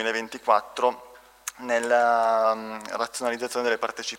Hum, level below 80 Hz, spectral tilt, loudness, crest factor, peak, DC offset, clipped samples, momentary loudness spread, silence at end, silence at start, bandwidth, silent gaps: none; -70 dBFS; -2 dB/octave; -25 LUFS; 20 dB; -4 dBFS; under 0.1%; under 0.1%; 13 LU; 0 s; 0 s; 16 kHz; none